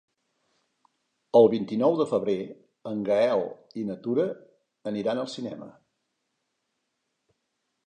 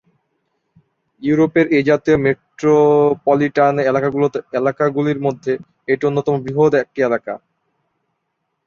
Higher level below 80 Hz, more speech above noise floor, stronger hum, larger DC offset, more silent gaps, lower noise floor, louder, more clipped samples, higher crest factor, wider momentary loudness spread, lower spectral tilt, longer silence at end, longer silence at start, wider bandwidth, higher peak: second, -74 dBFS vs -54 dBFS; about the same, 54 dB vs 57 dB; neither; neither; neither; first, -79 dBFS vs -73 dBFS; second, -26 LUFS vs -16 LUFS; neither; first, 22 dB vs 16 dB; first, 18 LU vs 9 LU; about the same, -7 dB/octave vs -7.5 dB/octave; first, 2.2 s vs 1.3 s; first, 1.35 s vs 1.2 s; first, 9.4 kHz vs 7 kHz; second, -6 dBFS vs -2 dBFS